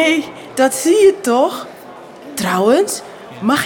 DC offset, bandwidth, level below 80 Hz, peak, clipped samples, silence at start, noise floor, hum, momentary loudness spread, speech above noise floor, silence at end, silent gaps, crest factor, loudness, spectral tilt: under 0.1%; 18.5 kHz; -60 dBFS; -2 dBFS; under 0.1%; 0 s; -36 dBFS; none; 22 LU; 22 dB; 0 s; none; 14 dB; -15 LUFS; -3.5 dB/octave